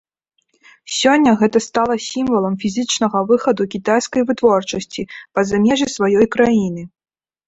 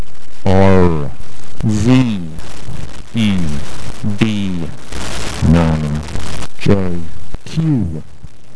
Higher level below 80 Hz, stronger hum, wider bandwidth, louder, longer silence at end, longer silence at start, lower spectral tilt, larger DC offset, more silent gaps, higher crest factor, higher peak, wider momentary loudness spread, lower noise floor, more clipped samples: second, -52 dBFS vs -30 dBFS; neither; second, 8.2 kHz vs 11 kHz; about the same, -16 LUFS vs -16 LUFS; first, 0.6 s vs 0 s; first, 0.85 s vs 0 s; second, -4.5 dB/octave vs -7 dB/octave; second, under 0.1% vs 20%; neither; about the same, 16 dB vs 16 dB; about the same, -2 dBFS vs 0 dBFS; second, 10 LU vs 18 LU; first, -51 dBFS vs -37 dBFS; neither